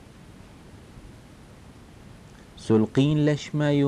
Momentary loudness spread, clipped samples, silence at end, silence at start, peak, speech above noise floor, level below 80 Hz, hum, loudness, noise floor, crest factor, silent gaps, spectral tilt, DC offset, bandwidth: 26 LU; under 0.1%; 0 s; 0.75 s; -10 dBFS; 26 dB; -52 dBFS; none; -23 LUFS; -48 dBFS; 16 dB; none; -7.5 dB/octave; under 0.1%; 10.5 kHz